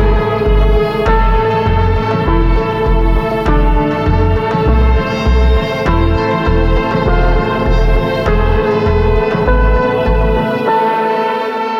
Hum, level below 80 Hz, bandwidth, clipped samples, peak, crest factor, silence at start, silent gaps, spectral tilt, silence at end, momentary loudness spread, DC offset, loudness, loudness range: none; -14 dBFS; 6.6 kHz; under 0.1%; 0 dBFS; 10 dB; 0 s; none; -8 dB/octave; 0 s; 2 LU; under 0.1%; -13 LUFS; 0 LU